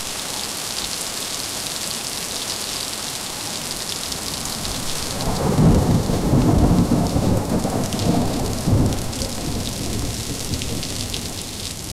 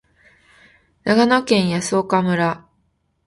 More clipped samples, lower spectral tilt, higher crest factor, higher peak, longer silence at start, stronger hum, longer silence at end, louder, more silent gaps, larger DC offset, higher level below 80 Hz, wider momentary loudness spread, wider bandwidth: neither; about the same, -4.5 dB/octave vs -5 dB/octave; about the same, 18 dB vs 20 dB; second, -4 dBFS vs 0 dBFS; second, 0 s vs 1.05 s; neither; second, 0.05 s vs 0.7 s; second, -22 LUFS vs -18 LUFS; neither; neither; first, -30 dBFS vs -56 dBFS; about the same, 8 LU vs 9 LU; first, 16.5 kHz vs 11.5 kHz